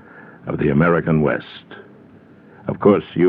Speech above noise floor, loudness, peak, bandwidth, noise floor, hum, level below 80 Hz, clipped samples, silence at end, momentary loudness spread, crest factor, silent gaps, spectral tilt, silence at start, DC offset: 29 dB; -18 LUFS; -2 dBFS; 4.8 kHz; -46 dBFS; none; -46 dBFS; under 0.1%; 0 s; 18 LU; 18 dB; none; -11 dB/octave; 0.15 s; under 0.1%